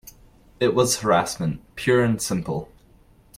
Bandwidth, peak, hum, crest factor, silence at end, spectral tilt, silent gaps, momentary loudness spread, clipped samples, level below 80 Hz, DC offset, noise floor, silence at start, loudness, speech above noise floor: 16.5 kHz; -6 dBFS; none; 18 dB; 0.75 s; -4.5 dB/octave; none; 9 LU; under 0.1%; -50 dBFS; under 0.1%; -54 dBFS; 0.05 s; -22 LUFS; 32 dB